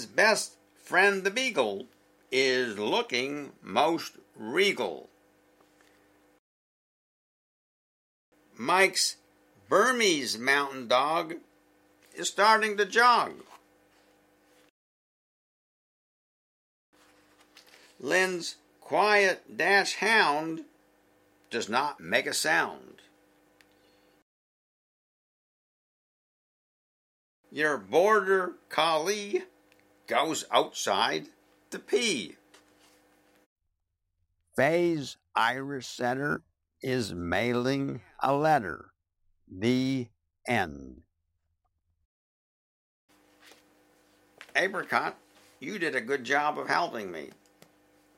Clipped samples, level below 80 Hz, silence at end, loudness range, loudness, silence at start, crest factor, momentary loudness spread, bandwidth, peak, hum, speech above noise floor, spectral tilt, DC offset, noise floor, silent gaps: under 0.1%; -70 dBFS; 0.9 s; 8 LU; -27 LUFS; 0 s; 24 dB; 16 LU; 16 kHz; -8 dBFS; none; 54 dB; -3 dB/octave; under 0.1%; -81 dBFS; 6.39-8.32 s, 14.70-16.93 s, 24.22-27.43 s, 33.46-33.56 s, 42.05-43.08 s